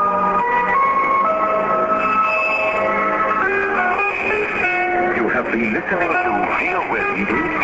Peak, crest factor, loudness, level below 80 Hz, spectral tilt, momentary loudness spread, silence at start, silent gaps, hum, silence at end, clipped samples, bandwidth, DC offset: -6 dBFS; 12 dB; -17 LUFS; -48 dBFS; -6 dB/octave; 3 LU; 0 s; none; none; 0 s; under 0.1%; 8 kHz; under 0.1%